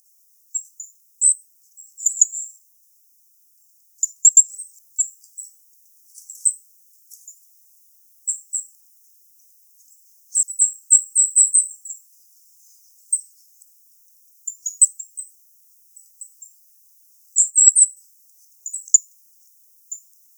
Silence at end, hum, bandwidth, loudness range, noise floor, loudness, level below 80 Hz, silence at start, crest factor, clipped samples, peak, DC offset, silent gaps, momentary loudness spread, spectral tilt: 0.4 s; none; over 20 kHz; 11 LU; -57 dBFS; -16 LUFS; under -90 dBFS; 0.55 s; 24 dB; under 0.1%; 0 dBFS; under 0.1%; none; 26 LU; 10.5 dB/octave